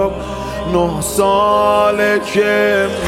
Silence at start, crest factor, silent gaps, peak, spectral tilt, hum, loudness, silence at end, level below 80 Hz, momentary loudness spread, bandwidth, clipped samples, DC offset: 0 s; 14 dB; none; -2 dBFS; -4.5 dB/octave; none; -14 LUFS; 0 s; -36 dBFS; 8 LU; 16.5 kHz; under 0.1%; under 0.1%